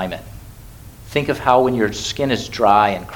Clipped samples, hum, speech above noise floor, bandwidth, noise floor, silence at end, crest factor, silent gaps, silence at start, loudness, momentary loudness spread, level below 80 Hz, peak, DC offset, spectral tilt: under 0.1%; none; 21 dB; 19 kHz; -39 dBFS; 0 s; 18 dB; none; 0 s; -17 LUFS; 13 LU; -42 dBFS; 0 dBFS; under 0.1%; -5 dB/octave